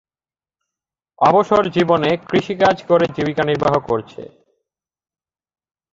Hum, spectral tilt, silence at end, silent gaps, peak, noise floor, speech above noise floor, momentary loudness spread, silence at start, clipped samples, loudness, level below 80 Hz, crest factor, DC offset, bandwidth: none; -6.5 dB/octave; 1.65 s; none; -2 dBFS; under -90 dBFS; over 74 dB; 8 LU; 1.2 s; under 0.1%; -17 LUFS; -52 dBFS; 18 dB; under 0.1%; 7.6 kHz